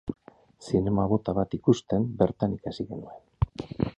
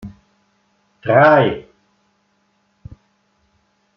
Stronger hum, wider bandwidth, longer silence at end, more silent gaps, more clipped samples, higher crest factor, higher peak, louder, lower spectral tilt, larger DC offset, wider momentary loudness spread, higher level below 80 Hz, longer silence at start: neither; first, 9.2 kHz vs 6 kHz; second, 0.1 s vs 2.35 s; neither; neither; about the same, 20 dB vs 18 dB; second, -8 dBFS vs -2 dBFS; second, -28 LUFS vs -14 LUFS; about the same, -8 dB/octave vs -8.5 dB/octave; neither; second, 15 LU vs 21 LU; first, -44 dBFS vs -54 dBFS; about the same, 0.05 s vs 0.05 s